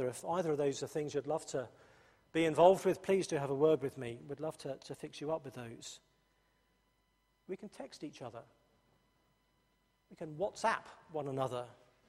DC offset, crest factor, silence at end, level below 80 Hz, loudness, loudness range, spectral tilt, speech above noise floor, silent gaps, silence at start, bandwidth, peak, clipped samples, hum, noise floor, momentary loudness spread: under 0.1%; 24 dB; 0.35 s; -74 dBFS; -35 LUFS; 19 LU; -5.5 dB/octave; 41 dB; none; 0 s; 14.5 kHz; -12 dBFS; under 0.1%; none; -77 dBFS; 18 LU